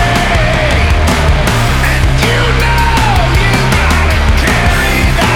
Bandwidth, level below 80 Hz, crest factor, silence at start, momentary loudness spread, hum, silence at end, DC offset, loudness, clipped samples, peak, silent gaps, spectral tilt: 17 kHz; -14 dBFS; 8 dB; 0 s; 1 LU; none; 0 s; under 0.1%; -10 LUFS; under 0.1%; 0 dBFS; none; -5 dB/octave